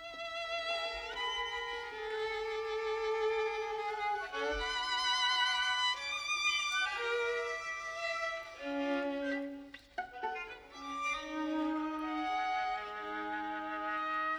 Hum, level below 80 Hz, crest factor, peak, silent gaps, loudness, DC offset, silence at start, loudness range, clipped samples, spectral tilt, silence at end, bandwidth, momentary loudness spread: none; -62 dBFS; 16 dB; -20 dBFS; none; -35 LUFS; under 0.1%; 0 s; 6 LU; under 0.1%; -1.5 dB/octave; 0 s; over 20 kHz; 10 LU